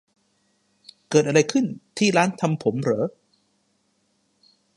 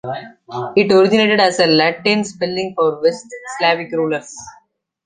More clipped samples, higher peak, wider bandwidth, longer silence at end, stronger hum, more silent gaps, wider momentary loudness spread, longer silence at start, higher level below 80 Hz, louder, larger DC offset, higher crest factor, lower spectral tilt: neither; about the same, -2 dBFS vs -2 dBFS; first, 11.5 kHz vs 9.6 kHz; first, 1.65 s vs 0.55 s; neither; neither; second, 7 LU vs 18 LU; first, 1.1 s vs 0.05 s; second, -70 dBFS vs -60 dBFS; second, -22 LUFS vs -15 LUFS; neither; first, 22 dB vs 16 dB; about the same, -5 dB/octave vs -4.5 dB/octave